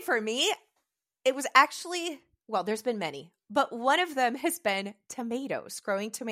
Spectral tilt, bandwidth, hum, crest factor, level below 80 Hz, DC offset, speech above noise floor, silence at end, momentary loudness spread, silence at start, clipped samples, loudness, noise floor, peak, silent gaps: -2.5 dB/octave; 16 kHz; none; 24 dB; -84 dBFS; under 0.1%; 52 dB; 0 s; 14 LU; 0 s; under 0.1%; -29 LUFS; -81 dBFS; -4 dBFS; none